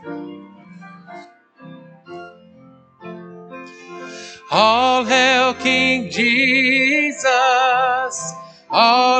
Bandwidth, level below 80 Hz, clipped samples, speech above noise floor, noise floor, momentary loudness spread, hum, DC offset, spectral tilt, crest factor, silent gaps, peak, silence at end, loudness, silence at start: 9.2 kHz; -62 dBFS; under 0.1%; 32 dB; -47 dBFS; 23 LU; none; under 0.1%; -2.5 dB/octave; 18 dB; none; 0 dBFS; 0 s; -15 LUFS; 0.05 s